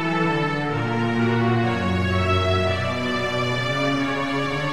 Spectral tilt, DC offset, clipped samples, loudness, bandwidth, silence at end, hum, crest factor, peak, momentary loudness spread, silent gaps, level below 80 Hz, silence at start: -6 dB/octave; 0.9%; under 0.1%; -22 LUFS; 12.5 kHz; 0 s; none; 12 dB; -10 dBFS; 3 LU; none; -48 dBFS; 0 s